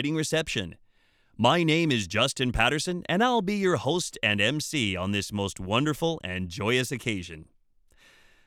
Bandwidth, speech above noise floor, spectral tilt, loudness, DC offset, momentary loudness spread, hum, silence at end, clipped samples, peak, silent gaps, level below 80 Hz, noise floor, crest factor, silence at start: 17.5 kHz; 37 dB; -4.5 dB/octave; -26 LUFS; under 0.1%; 9 LU; none; 1.05 s; under 0.1%; -6 dBFS; none; -48 dBFS; -64 dBFS; 20 dB; 0 s